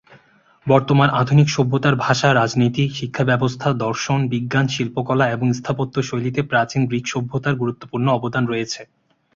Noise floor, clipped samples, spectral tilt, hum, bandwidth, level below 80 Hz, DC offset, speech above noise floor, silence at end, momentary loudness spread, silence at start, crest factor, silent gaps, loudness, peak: -54 dBFS; under 0.1%; -6 dB/octave; none; 7.6 kHz; -54 dBFS; under 0.1%; 36 dB; 0.5 s; 7 LU; 0.1 s; 18 dB; none; -19 LUFS; -2 dBFS